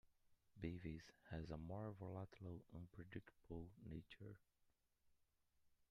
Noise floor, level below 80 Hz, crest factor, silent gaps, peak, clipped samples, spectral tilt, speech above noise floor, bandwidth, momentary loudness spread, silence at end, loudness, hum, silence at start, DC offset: -83 dBFS; -70 dBFS; 22 dB; none; -34 dBFS; under 0.1%; -8 dB/octave; 29 dB; 10.5 kHz; 8 LU; 0.15 s; -56 LUFS; none; 0.05 s; under 0.1%